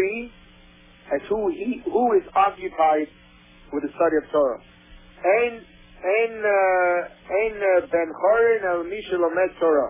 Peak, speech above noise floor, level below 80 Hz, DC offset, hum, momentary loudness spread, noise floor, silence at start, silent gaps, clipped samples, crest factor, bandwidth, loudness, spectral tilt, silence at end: -8 dBFS; 29 dB; -54 dBFS; under 0.1%; none; 11 LU; -50 dBFS; 0 s; none; under 0.1%; 14 dB; 3.8 kHz; -22 LUFS; -8.5 dB/octave; 0 s